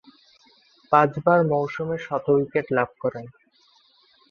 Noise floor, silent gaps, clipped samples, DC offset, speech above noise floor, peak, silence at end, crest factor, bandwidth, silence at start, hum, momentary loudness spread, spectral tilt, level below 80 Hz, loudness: -60 dBFS; none; under 0.1%; under 0.1%; 38 dB; -2 dBFS; 1 s; 22 dB; 6.8 kHz; 0.9 s; none; 10 LU; -8.5 dB/octave; -64 dBFS; -22 LUFS